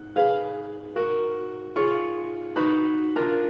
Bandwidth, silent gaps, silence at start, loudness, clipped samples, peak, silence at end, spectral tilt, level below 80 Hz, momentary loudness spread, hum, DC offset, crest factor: 5.6 kHz; none; 0 s; -26 LUFS; under 0.1%; -10 dBFS; 0 s; -8 dB/octave; -66 dBFS; 9 LU; none; under 0.1%; 14 dB